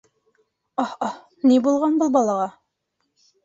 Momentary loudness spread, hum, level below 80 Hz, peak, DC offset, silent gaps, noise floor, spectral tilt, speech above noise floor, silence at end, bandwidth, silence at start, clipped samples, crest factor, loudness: 12 LU; none; -68 dBFS; -6 dBFS; under 0.1%; none; -75 dBFS; -5.5 dB/octave; 56 dB; 0.95 s; 7.8 kHz; 0.8 s; under 0.1%; 18 dB; -21 LUFS